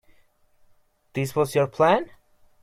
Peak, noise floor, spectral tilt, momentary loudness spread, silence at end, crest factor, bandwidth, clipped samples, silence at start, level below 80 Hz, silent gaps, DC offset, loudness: -6 dBFS; -60 dBFS; -6 dB/octave; 13 LU; 0.55 s; 20 dB; 16 kHz; under 0.1%; 1.15 s; -60 dBFS; none; under 0.1%; -23 LUFS